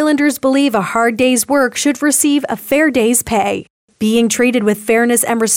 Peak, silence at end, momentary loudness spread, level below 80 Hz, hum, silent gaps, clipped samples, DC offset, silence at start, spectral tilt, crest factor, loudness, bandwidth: -2 dBFS; 0 s; 4 LU; -50 dBFS; none; 3.70-3.88 s; under 0.1%; under 0.1%; 0 s; -3 dB/octave; 12 dB; -13 LUFS; over 20 kHz